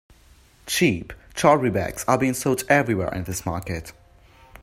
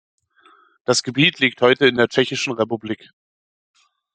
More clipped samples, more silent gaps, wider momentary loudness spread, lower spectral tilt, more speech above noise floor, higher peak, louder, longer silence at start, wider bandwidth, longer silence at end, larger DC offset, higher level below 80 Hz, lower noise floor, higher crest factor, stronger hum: neither; neither; about the same, 14 LU vs 14 LU; about the same, -5 dB/octave vs -4 dB/octave; second, 31 dB vs 35 dB; about the same, -2 dBFS vs -2 dBFS; second, -22 LUFS vs -18 LUFS; second, 0.65 s vs 0.9 s; first, 16 kHz vs 9.4 kHz; second, 0.05 s vs 1.2 s; neither; first, -48 dBFS vs -64 dBFS; about the same, -53 dBFS vs -54 dBFS; about the same, 22 dB vs 20 dB; neither